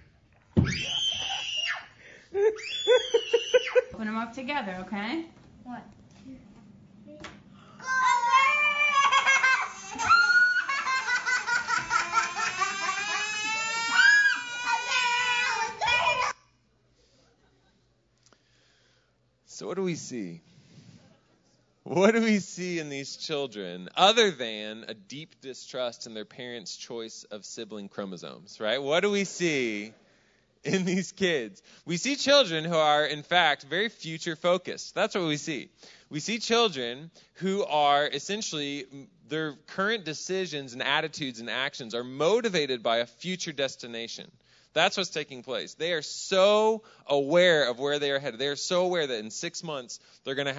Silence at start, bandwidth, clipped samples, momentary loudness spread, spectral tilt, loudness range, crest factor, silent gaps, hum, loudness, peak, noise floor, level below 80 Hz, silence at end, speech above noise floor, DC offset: 0.55 s; 8 kHz; under 0.1%; 18 LU; -3 dB/octave; 13 LU; 22 dB; none; none; -26 LUFS; -6 dBFS; -69 dBFS; -64 dBFS; 0 s; 40 dB; under 0.1%